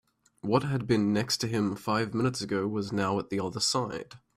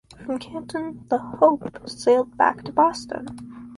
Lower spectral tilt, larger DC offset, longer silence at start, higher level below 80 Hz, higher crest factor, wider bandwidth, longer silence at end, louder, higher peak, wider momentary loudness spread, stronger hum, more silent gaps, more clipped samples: about the same, -5 dB/octave vs -5 dB/octave; neither; first, 0.45 s vs 0.2 s; about the same, -62 dBFS vs -58 dBFS; about the same, 18 dB vs 20 dB; first, 15 kHz vs 11.5 kHz; first, 0.2 s vs 0 s; second, -29 LUFS vs -22 LUFS; second, -12 dBFS vs -4 dBFS; second, 5 LU vs 14 LU; neither; neither; neither